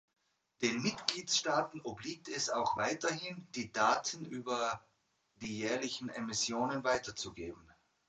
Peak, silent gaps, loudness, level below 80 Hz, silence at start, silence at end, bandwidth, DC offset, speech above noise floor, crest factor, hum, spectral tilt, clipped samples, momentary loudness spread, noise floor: -10 dBFS; none; -36 LUFS; -70 dBFS; 0.6 s; 0.5 s; 9.4 kHz; under 0.1%; 39 dB; 28 dB; none; -2.5 dB/octave; under 0.1%; 12 LU; -76 dBFS